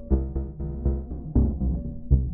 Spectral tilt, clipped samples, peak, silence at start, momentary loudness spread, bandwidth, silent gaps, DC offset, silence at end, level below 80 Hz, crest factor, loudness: -16 dB/octave; under 0.1%; -6 dBFS; 0 s; 8 LU; 1.5 kHz; none; under 0.1%; 0 s; -26 dBFS; 18 dB; -28 LUFS